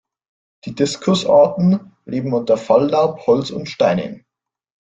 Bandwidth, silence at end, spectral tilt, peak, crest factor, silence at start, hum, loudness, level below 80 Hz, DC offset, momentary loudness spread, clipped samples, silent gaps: 9.2 kHz; 0.75 s; -6.5 dB/octave; -2 dBFS; 16 dB; 0.65 s; none; -17 LUFS; -58 dBFS; under 0.1%; 13 LU; under 0.1%; none